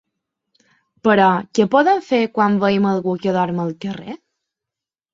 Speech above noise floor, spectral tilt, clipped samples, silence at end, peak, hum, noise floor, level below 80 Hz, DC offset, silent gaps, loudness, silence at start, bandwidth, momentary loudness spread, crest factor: 70 dB; -6.5 dB/octave; under 0.1%; 1 s; -2 dBFS; none; -87 dBFS; -62 dBFS; under 0.1%; none; -17 LUFS; 1.05 s; 7.6 kHz; 14 LU; 18 dB